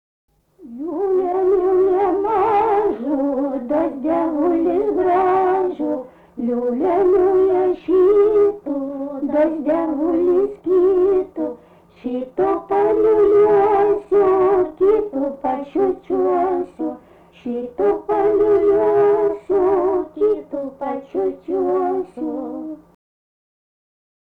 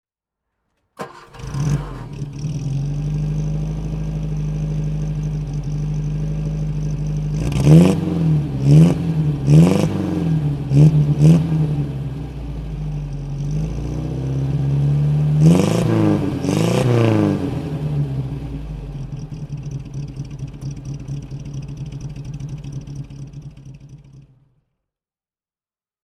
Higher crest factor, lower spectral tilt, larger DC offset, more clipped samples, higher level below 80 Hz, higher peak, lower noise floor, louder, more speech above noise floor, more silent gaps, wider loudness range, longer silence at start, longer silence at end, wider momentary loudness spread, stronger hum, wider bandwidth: second, 10 dB vs 18 dB; about the same, -8.5 dB/octave vs -8 dB/octave; neither; neither; second, -50 dBFS vs -34 dBFS; second, -8 dBFS vs 0 dBFS; second, -47 dBFS vs under -90 dBFS; about the same, -18 LUFS vs -18 LUFS; second, 29 dB vs over 78 dB; neither; second, 5 LU vs 16 LU; second, 0.6 s vs 1 s; second, 1.45 s vs 1.85 s; second, 12 LU vs 18 LU; neither; second, 4 kHz vs 12 kHz